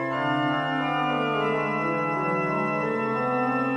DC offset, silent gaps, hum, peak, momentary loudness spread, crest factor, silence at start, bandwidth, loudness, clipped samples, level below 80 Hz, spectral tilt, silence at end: under 0.1%; none; none; -12 dBFS; 1 LU; 12 dB; 0 s; 10.5 kHz; -25 LUFS; under 0.1%; -64 dBFS; -7 dB/octave; 0 s